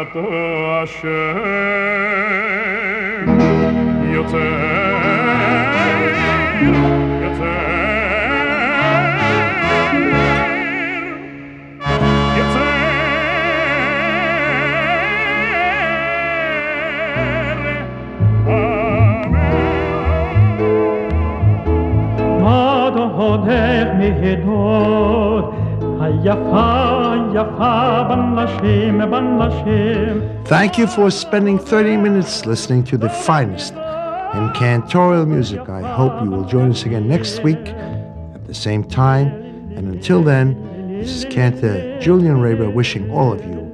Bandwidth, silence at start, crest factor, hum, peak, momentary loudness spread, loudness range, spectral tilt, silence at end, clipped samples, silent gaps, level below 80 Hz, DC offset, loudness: 10.5 kHz; 0 s; 16 dB; none; 0 dBFS; 7 LU; 3 LU; -7 dB/octave; 0 s; under 0.1%; none; -32 dBFS; under 0.1%; -16 LUFS